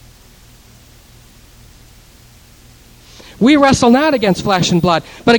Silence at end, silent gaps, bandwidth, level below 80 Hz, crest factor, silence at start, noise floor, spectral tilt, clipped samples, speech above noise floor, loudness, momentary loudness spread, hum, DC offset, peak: 0 s; none; 18.5 kHz; -42 dBFS; 16 dB; 3.4 s; -43 dBFS; -5 dB/octave; under 0.1%; 32 dB; -12 LUFS; 6 LU; none; under 0.1%; 0 dBFS